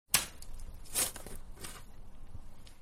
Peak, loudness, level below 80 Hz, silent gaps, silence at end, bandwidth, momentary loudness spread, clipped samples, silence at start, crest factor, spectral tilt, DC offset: -8 dBFS; -35 LUFS; -48 dBFS; none; 0 s; 16 kHz; 24 LU; under 0.1%; 0.1 s; 30 dB; -0.5 dB/octave; under 0.1%